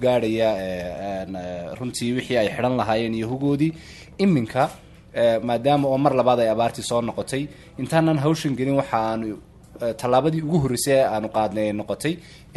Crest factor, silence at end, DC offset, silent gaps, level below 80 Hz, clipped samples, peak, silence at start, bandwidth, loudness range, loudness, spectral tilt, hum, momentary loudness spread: 18 dB; 0.2 s; under 0.1%; none; -50 dBFS; under 0.1%; -4 dBFS; 0 s; 12.5 kHz; 3 LU; -22 LUFS; -6 dB/octave; none; 11 LU